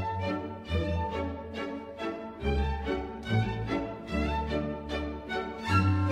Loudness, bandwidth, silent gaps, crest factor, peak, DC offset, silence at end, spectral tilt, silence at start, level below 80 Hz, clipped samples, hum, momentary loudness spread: -32 LUFS; 10 kHz; none; 18 dB; -12 dBFS; under 0.1%; 0 s; -7.5 dB/octave; 0 s; -40 dBFS; under 0.1%; none; 8 LU